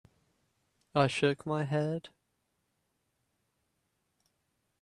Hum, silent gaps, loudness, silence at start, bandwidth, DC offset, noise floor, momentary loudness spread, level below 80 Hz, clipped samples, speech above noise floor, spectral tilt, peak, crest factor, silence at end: none; none; -31 LUFS; 0.95 s; 11 kHz; under 0.1%; -80 dBFS; 8 LU; -72 dBFS; under 0.1%; 49 dB; -6 dB/octave; -12 dBFS; 24 dB; 2.75 s